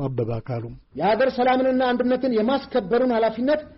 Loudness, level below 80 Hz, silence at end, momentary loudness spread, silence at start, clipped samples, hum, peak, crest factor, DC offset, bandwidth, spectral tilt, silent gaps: -22 LUFS; -50 dBFS; 0.05 s; 9 LU; 0 s; under 0.1%; none; -10 dBFS; 10 dB; under 0.1%; 5.8 kHz; -5 dB/octave; none